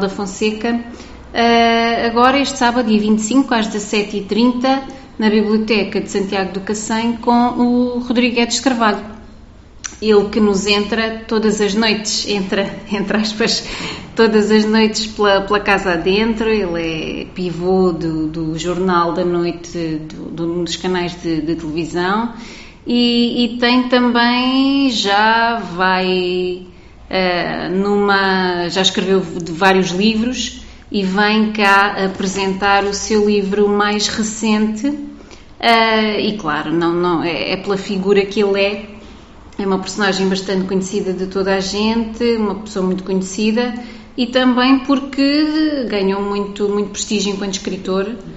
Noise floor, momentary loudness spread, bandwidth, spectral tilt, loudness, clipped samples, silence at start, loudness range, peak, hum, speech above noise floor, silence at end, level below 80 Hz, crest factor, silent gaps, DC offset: -39 dBFS; 9 LU; 8.2 kHz; -4.5 dB/octave; -16 LUFS; under 0.1%; 0 s; 4 LU; 0 dBFS; none; 23 dB; 0 s; -42 dBFS; 16 dB; none; under 0.1%